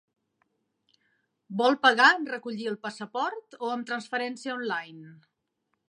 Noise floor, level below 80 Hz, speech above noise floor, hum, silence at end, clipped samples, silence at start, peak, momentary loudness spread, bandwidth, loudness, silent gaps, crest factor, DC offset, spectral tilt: -79 dBFS; -86 dBFS; 52 dB; none; 0.75 s; under 0.1%; 1.5 s; -4 dBFS; 15 LU; 11 kHz; -27 LUFS; none; 24 dB; under 0.1%; -3.5 dB/octave